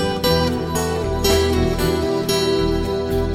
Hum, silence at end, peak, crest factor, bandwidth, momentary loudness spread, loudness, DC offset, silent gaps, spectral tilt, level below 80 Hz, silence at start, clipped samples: none; 0 s; -2 dBFS; 16 dB; 16 kHz; 4 LU; -19 LUFS; under 0.1%; none; -5 dB/octave; -28 dBFS; 0 s; under 0.1%